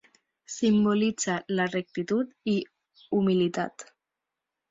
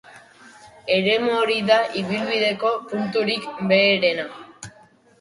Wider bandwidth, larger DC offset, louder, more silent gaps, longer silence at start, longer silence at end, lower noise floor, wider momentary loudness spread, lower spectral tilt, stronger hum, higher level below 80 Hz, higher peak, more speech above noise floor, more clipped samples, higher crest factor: second, 7.8 kHz vs 11.5 kHz; neither; second, -27 LUFS vs -20 LUFS; neither; first, 0.5 s vs 0.1 s; first, 0.9 s vs 0.5 s; first, -87 dBFS vs -53 dBFS; second, 11 LU vs 19 LU; about the same, -5 dB/octave vs -5 dB/octave; neither; about the same, -66 dBFS vs -64 dBFS; second, -14 dBFS vs -4 dBFS; first, 61 dB vs 32 dB; neither; about the same, 14 dB vs 18 dB